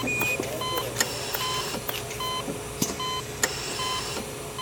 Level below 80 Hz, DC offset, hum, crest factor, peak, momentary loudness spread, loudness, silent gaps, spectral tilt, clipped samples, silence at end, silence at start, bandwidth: -50 dBFS; under 0.1%; none; 24 dB; -6 dBFS; 5 LU; -28 LUFS; none; -2.5 dB/octave; under 0.1%; 0 s; 0 s; over 20 kHz